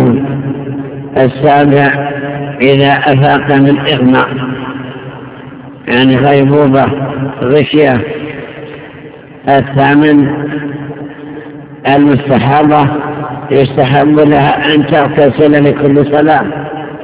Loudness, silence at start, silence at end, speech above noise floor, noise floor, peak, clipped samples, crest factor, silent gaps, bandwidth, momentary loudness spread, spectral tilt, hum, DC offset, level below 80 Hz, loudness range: -9 LUFS; 0 s; 0 s; 23 dB; -30 dBFS; 0 dBFS; 2%; 10 dB; none; 4 kHz; 18 LU; -11 dB/octave; none; under 0.1%; -40 dBFS; 4 LU